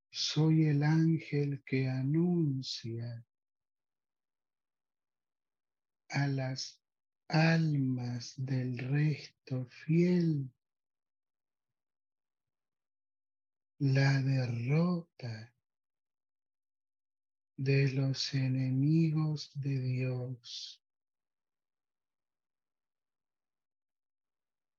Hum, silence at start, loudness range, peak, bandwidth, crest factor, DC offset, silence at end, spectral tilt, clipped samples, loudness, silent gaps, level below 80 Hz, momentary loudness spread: none; 0.15 s; 10 LU; -16 dBFS; 7.2 kHz; 18 dB; under 0.1%; 4.05 s; -6.5 dB/octave; under 0.1%; -32 LUFS; none; -76 dBFS; 14 LU